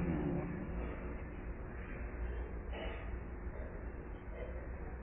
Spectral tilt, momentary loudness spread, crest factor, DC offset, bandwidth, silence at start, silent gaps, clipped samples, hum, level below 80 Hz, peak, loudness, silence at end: -6 dB/octave; 8 LU; 16 dB; under 0.1%; 3.6 kHz; 0 s; none; under 0.1%; none; -46 dBFS; -26 dBFS; -44 LUFS; 0 s